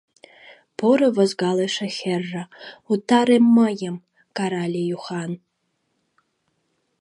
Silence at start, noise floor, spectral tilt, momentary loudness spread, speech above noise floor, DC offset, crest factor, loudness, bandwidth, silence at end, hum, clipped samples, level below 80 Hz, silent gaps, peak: 0.45 s; -73 dBFS; -6 dB/octave; 19 LU; 53 dB; under 0.1%; 18 dB; -21 LUFS; 11 kHz; 1.65 s; none; under 0.1%; -74 dBFS; none; -4 dBFS